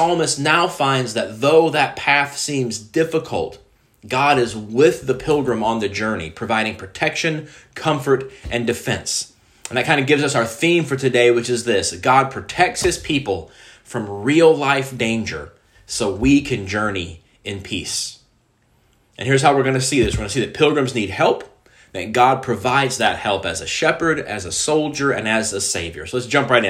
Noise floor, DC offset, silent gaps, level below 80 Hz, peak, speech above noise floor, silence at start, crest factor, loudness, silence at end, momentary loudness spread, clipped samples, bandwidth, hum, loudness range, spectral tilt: -60 dBFS; under 0.1%; none; -44 dBFS; 0 dBFS; 41 dB; 0 s; 18 dB; -18 LUFS; 0 s; 10 LU; under 0.1%; 16 kHz; none; 4 LU; -4 dB/octave